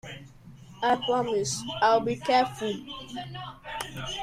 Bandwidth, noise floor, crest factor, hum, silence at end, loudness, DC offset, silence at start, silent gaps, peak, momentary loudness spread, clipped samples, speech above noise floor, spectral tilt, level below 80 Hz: 15.5 kHz; -49 dBFS; 18 dB; none; 0 s; -27 LUFS; under 0.1%; 0.05 s; none; -10 dBFS; 15 LU; under 0.1%; 21 dB; -3.5 dB/octave; -56 dBFS